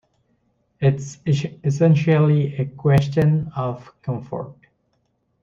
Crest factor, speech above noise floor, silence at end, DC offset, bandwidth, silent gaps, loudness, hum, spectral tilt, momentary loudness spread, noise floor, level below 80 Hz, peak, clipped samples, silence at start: 16 dB; 49 dB; 0.9 s; under 0.1%; 7.6 kHz; none; -20 LUFS; none; -8 dB/octave; 13 LU; -68 dBFS; -52 dBFS; -4 dBFS; under 0.1%; 0.8 s